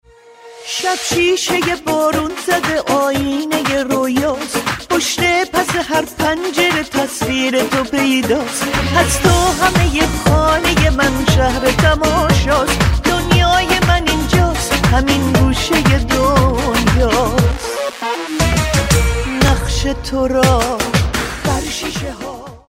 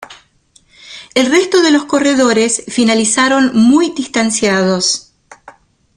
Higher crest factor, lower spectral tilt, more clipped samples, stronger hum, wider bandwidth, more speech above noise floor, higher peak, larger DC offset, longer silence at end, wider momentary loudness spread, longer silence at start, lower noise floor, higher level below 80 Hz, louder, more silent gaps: about the same, 14 dB vs 14 dB; first, -4.5 dB/octave vs -3 dB/octave; neither; neither; first, 16.5 kHz vs 11.5 kHz; second, 26 dB vs 40 dB; about the same, 0 dBFS vs 0 dBFS; neither; second, 0.1 s vs 0.95 s; about the same, 6 LU vs 6 LU; first, 0.45 s vs 0 s; second, -40 dBFS vs -51 dBFS; first, -24 dBFS vs -52 dBFS; about the same, -14 LUFS vs -12 LUFS; neither